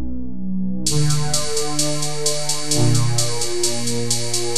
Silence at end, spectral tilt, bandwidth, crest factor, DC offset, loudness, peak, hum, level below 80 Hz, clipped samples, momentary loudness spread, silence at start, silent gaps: 0 s; -3.5 dB/octave; 13 kHz; 16 dB; 9%; -20 LUFS; -4 dBFS; none; -40 dBFS; under 0.1%; 7 LU; 0 s; none